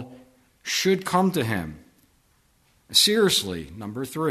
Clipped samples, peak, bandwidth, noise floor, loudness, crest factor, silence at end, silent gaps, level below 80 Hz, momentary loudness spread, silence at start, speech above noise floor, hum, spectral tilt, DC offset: under 0.1%; -4 dBFS; 13.5 kHz; -63 dBFS; -22 LUFS; 20 dB; 0 s; none; -56 dBFS; 18 LU; 0 s; 40 dB; none; -3.5 dB/octave; under 0.1%